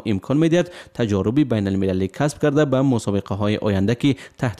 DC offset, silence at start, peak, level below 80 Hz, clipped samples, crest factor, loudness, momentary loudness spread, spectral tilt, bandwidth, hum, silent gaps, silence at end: under 0.1%; 0.05 s; -8 dBFS; -52 dBFS; under 0.1%; 12 dB; -20 LUFS; 5 LU; -7 dB/octave; 12.5 kHz; none; none; 0.05 s